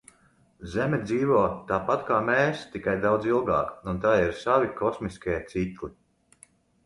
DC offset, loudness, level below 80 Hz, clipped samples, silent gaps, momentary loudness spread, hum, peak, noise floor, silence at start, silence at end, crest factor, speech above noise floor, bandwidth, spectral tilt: under 0.1%; -26 LUFS; -50 dBFS; under 0.1%; none; 9 LU; none; -8 dBFS; -62 dBFS; 0.6 s; 0.95 s; 20 dB; 36 dB; 11.5 kHz; -7 dB/octave